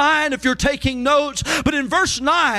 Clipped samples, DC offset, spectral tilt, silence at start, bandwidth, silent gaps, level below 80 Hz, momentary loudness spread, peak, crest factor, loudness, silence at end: under 0.1%; under 0.1%; -3 dB/octave; 0 s; 15.5 kHz; none; -36 dBFS; 3 LU; -6 dBFS; 12 dB; -18 LUFS; 0 s